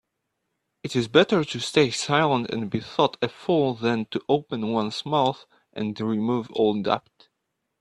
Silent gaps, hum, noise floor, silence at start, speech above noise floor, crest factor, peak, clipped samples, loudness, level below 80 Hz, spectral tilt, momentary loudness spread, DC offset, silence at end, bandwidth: none; none; -79 dBFS; 0.85 s; 55 dB; 22 dB; -2 dBFS; under 0.1%; -24 LUFS; -64 dBFS; -5 dB/octave; 8 LU; under 0.1%; 0.8 s; 11.5 kHz